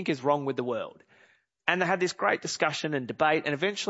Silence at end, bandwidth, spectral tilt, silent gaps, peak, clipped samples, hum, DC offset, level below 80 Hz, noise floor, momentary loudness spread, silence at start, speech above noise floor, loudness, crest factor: 0 s; 8 kHz; -4 dB/octave; none; -6 dBFS; under 0.1%; none; under 0.1%; -76 dBFS; -63 dBFS; 6 LU; 0 s; 35 dB; -28 LUFS; 24 dB